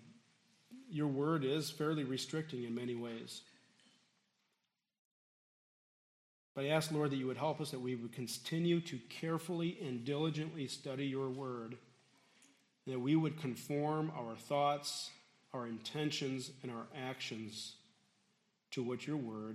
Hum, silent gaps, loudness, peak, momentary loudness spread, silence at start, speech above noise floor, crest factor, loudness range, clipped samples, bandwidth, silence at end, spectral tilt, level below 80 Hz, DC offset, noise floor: none; 4.99-6.55 s; -40 LUFS; -20 dBFS; 12 LU; 0 s; 47 dB; 20 dB; 6 LU; under 0.1%; 14 kHz; 0 s; -5.5 dB/octave; -84 dBFS; under 0.1%; -86 dBFS